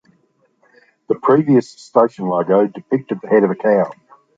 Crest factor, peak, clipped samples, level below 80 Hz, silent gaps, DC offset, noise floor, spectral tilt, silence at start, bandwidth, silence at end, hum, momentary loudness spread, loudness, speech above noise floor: 16 dB; -2 dBFS; under 0.1%; -66 dBFS; none; under 0.1%; -60 dBFS; -8.5 dB/octave; 1.1 s; 7.8 kHz; 0.45 s; none; 7 LU; -16 LUFS; 45 dB